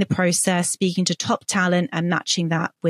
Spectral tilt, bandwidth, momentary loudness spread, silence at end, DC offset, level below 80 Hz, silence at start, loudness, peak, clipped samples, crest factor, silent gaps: -4 dB/octave; 14 kHz; 4 LU; 0 s; under 0.1%; -62 dBFS; 0 s; -21 LUFS; -6 dBFS; under 0.1%; 16 dB; none